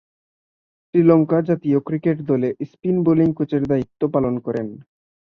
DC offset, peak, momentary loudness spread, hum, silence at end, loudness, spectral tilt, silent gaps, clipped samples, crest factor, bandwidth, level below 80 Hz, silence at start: under 0.1%; -2 dBFS; 10 LU; none; 0.5 s; -19 LUFS; -11 dB/octave; none; under 0.1%; 18 dB; 5 kHz; -56 dBFS; 0.95 s